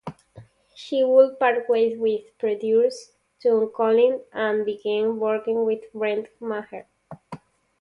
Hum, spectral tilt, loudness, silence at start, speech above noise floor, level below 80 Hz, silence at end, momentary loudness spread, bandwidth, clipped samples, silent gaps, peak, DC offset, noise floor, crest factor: none; -5.5 dB/octave; -22 LUFS; 0.05 s; 27 dB; -70 dBFS; 0.45 s; 21 LU; 10.5 kHz; under 0.1%; none; -4 dBFS; under 0.1%; -49 dBFS; 18 dB